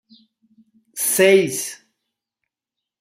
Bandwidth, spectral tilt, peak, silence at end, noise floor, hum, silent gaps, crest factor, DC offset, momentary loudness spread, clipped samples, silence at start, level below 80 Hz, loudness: 16 kHz; -3 dB/octave; -2 dBFS; 1.25 s; -85 dBFS; none; none; 20 dB; under 0.1%; 17 LU; under 0.1%; 0.95 s; -68 dBFS; -17 LUFS